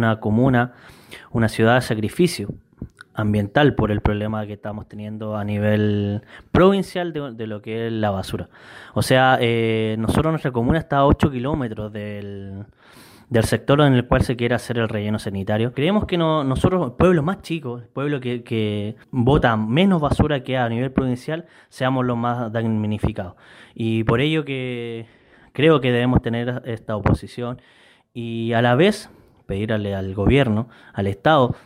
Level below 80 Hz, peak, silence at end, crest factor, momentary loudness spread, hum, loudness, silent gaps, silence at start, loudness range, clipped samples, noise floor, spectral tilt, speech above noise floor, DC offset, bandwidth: -38 dBFS; -4 dBFS; 0.1 s; 16 dB; 14 LU; none; -20 LUFS; none; 0 s; 3 LU; under 0.1%; -47 dBFS; -7 dB/octave; 27 dB; under 0.1%; 15.5 kHz